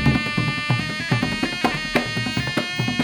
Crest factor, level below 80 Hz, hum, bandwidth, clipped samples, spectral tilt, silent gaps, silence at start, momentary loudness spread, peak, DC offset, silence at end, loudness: 20 dB; -40 dBFS; none; 18 kHz; under 0.1%; -5 dB/octave; none; 0 s; 2 LU; -2 dBFS; under 0.1%; 0 s; -22 LUFS